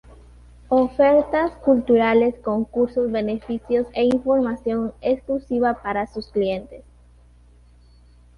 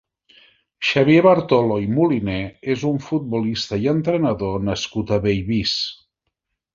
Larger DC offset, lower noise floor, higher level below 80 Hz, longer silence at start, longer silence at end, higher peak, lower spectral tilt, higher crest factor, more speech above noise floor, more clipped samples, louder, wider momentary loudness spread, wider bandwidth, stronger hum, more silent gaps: neither; second, -50 dBFS vs -77 dBFS; about the same, -48 dBFS vs -46 dBFS; about the same, 0.7 s vs 0.8 s; first, 1.55 s vs 0.8 s; second, -6 dBFS vs -2 dBFS; first, -7.5 dB/octave vs -6 dB/octave; about the same, 16 dB vs 18 dB; second, 30 dB vs 58 dB; neither; about the same, -21 LUFS vs -19 LUFS; about the same, 9 LU vs 9 LU; first, 10.5 kHz vs 7.6 kHz; first, 60 Hz at -45 dBFS vs none; neither